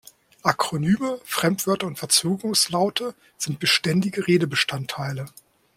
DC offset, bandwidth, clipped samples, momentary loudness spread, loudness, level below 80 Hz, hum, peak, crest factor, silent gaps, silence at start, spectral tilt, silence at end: under 0.1%; 16.5 kHz; under 0.1%; 10 LU; -22 LUFS; -60 dBFS; none; -4 dBFS; 20 dB; none; 0.45 s; -3.5 dB/octave; 0.45 s